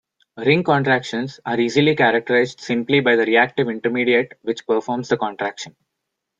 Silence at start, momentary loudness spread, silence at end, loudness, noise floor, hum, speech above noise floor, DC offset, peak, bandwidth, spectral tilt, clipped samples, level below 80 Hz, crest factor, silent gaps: 0.35 s; 11 LU; 0.7 s; -19 LUFS; -79 dBFS; none; 60 dB; under 0.1%; -2 dBFS; 7.8 kHz; -5.5 dB/octave; under 0.1%; -64 dBFS; 18 dB; none